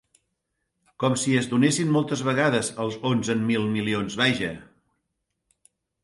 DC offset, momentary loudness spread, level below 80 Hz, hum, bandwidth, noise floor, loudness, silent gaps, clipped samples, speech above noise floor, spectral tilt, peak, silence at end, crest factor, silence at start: under 0.1%; 7 LU; -60 dBFS; none; 11.5 kHz; -79 dBFS; -24 LUFS; none; under 0.1%; 55 dB; -4.5 dB/octave; -8 dBFS; 1.4 s; 18 dB; 1 s